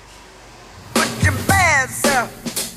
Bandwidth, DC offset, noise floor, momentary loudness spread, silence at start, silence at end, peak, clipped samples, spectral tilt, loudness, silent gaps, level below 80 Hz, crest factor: 16.5 kHz; under 0.1%; -42 dBFS; 10 LU; 0.1 s; 0 s; -2 dBFS; under 0.1%; -3.5 dB/octave; -17 LUFS; none; -40 dBFS; 16 dB